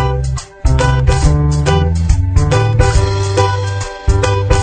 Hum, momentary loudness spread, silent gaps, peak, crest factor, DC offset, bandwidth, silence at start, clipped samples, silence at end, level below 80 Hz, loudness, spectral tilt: none; 6 LU; none; 0 dBFS; 12 dB; under 0.1%; 9.4 kHz; 0 s; under 0.1%; 0 s; -16 dBFS; -14 LUFS; -6 dB/octave